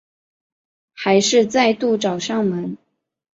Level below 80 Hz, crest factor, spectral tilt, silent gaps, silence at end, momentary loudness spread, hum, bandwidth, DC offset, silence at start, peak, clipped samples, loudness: -64 dBFS; 16 dB; -4 dB/octave; none; 0.55 s; 12 LU; none; 8 kHz; under 0.1%; 1 s; -4 dBFS; under 0.1%; -18 LUFS